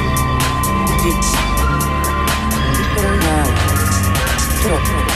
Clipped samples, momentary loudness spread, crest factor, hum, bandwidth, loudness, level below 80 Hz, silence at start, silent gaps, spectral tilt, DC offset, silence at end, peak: under 0.1%; 2 LU; 12 dB; none; 15.5 kHz; -16 LUFS; -20 dBFS; 0 s; none; -4.5 dB/octave; under 0.1%; 0 s; -4 dBFS